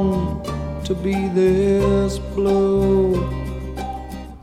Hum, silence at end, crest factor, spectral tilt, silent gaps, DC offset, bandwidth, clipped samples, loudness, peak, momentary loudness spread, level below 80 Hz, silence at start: none; 0.05 s; 12 dB; -7.5 dB/octave; none; under 0.1%; 13.5 kHz; under 0.1%; -20 LUFS; -6 dBFS; 12 LU; -30 dBFS; 0 s